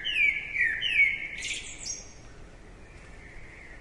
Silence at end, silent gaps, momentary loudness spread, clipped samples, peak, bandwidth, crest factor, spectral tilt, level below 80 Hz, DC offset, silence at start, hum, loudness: 0 s; none; 25 LU; under 0.1%; -12 dBFS; 11.5 kHz; 18 dB; 0 dB/octave; -50 dBFS; under 0.1%; 0 s; none; -26 LUFS